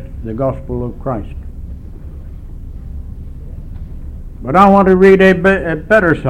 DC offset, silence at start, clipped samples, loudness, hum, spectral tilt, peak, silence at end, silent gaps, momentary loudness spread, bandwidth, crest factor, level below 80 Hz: under 0.1%; 0 s; 0.1%; -11 LUFS; none; -8 dB/octave; 0 dBFS; 0 s; none; 24 LU; 9.4 kHz; 14 dB; -28 dBFS